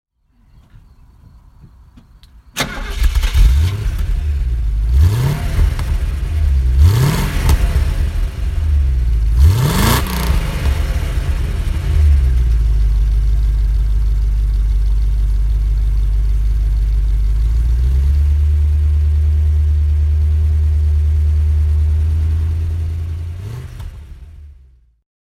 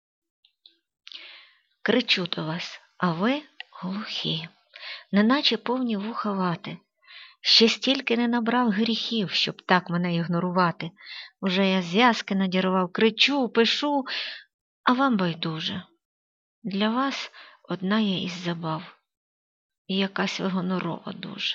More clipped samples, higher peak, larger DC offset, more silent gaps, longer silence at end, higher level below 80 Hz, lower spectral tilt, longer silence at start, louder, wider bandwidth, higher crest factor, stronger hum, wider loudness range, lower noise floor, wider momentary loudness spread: neither; first, 0 dBFS vs -4 dBFS; neither; second, none vs 14.54-14.84 s, 16.05-16.62 s, 19.17-19.70 s, 19.78-19.85 s; first, 0.8 s vs 0 s; first, -16 dBFS vs -72 dBFS; about the same, -6 dB/octave vs -5 dB/octave; first, 1.65 s vs 1.15 s; first, -17 LUFS vs -24 LUFS; first, 16 kHz vs 7.6 kHz; second, 14 dB vs 22 dB; neither; about the same, 4 LU vs 6 LU; second, -52 dBFS vs -60 dBFS; second, 7 LU vs 16 LU